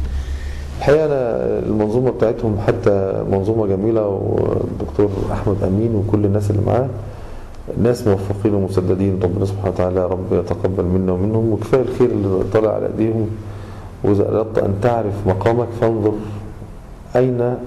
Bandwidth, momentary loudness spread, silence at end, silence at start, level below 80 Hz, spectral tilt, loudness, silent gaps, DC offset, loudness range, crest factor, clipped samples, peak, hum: 12.5 kHz; 11 LU; 0 s; 0 s; -34 dBFS; -9 dB/octave; -18 LUFS; none; under 0.1%; 1 LU; 12 dB; under 0.1%; -4 dBFS; none